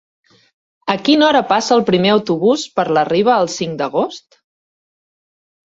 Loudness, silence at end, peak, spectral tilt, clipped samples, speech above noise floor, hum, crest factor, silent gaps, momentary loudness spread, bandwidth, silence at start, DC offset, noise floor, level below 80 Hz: -15 LUFS; 1.5 s; -2 dBFS; -4.5 dB/octave; under 0.1%; over 75 dB; none; 16 dB; none; 9 LU; 8 kHz; 0.85 s; under 0.1%; under -90 dBFS; -58 dBFS